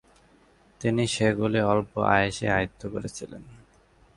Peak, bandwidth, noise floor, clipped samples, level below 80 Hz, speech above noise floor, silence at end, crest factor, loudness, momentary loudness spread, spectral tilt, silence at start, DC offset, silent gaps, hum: -6 dBFS; 11.5 kHz; -59 dBFS; under 0.1%; -50 dBFS; 34 dB; 0.6 s; 22 dB; -25 LUFS; 15 LU; -5.5 dB/octave; 0.8 s; under 0.1%; none; none